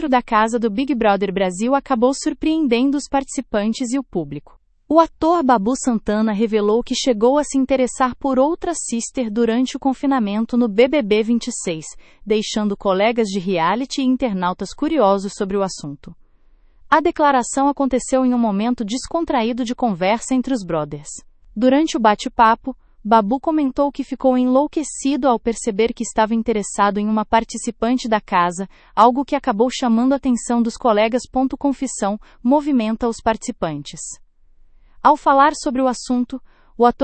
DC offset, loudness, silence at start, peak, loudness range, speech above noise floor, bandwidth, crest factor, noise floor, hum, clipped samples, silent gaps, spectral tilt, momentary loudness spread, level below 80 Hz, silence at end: under 0.1%; -18 LUFS; 0 s; 0 dBFS; 2 LU; 33 dB; 8.8 kHz; 18 dB; -51 dBFS; none; under 0.1%; none; -4.5 dB/octave; 9 LU; -46 dBFS; 0 s